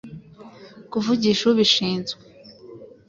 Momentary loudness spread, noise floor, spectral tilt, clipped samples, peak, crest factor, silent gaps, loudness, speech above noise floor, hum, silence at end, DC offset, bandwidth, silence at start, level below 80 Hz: 22 LU; -44 dBFS; -4.5 dB/octave; under 0.1%; -6 dBFS; 18 dB; none; -20 LUFS; 24 dB; none; 0.2 s; under 0.1%; 7.6 kHz; 0.05 s; -60 dBFS